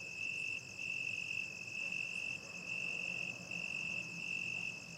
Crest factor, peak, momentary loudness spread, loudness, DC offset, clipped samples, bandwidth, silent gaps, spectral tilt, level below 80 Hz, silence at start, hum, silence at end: 12 dB; -30 dBFS; 3 LU; -40 LUFS; under 0.1%; under 0.1%; 16 kHz; none; -2 dB/octave; -78 dBFS; 0 s; none; 0 s